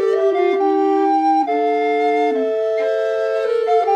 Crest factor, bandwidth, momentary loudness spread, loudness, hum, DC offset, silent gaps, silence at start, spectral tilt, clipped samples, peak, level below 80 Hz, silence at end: 10 dB; 8.4 kHz; 3 LU; -17 LUFS; none; under 0.1%; none; 0 s; -4 dB/octave; under 0.1%; -6 dBFS; -68 dBFS; 0 s